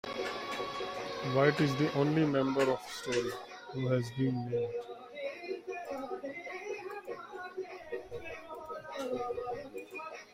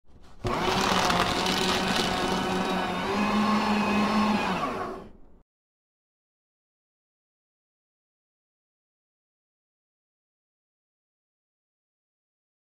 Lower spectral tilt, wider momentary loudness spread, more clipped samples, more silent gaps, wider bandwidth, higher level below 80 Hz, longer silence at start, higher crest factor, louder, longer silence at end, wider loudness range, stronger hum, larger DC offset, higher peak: first, -6 dB/octave vs -4 dB/octave; first, 14 LU vs 8 LU; neither; neither; about the same, 16 kHz vs 16 kHz; second, -68 dBFS vs -50 dBFS; about the same, 0.05 s vs 0.1 s; about the same, 22 dB vs 22 dB; second, -35 LUFS vs -25 LUFS; second, 0 s vs 7.35 s; about the same, 10 LU vs 10 LU; neither; neither; second, -12 dBFS vs -8 dBFS